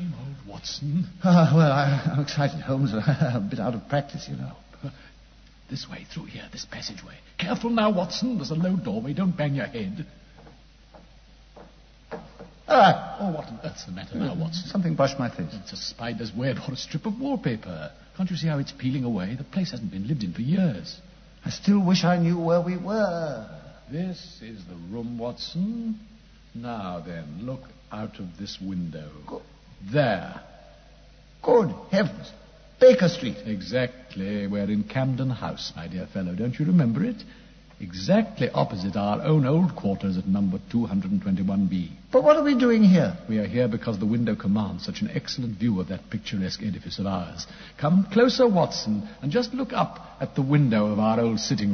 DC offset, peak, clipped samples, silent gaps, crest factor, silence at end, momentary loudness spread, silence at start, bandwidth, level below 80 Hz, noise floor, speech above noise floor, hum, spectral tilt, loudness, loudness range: under 0.1%; -4 dBFS; under 0.1%; none; 20 dB; 0 s; 18 LU; 0 s; 6.6 kHz; -52 dBFS; -51 dBFS; 27 dB; none; -7 dB/octave; -25 LUFS; 11 LU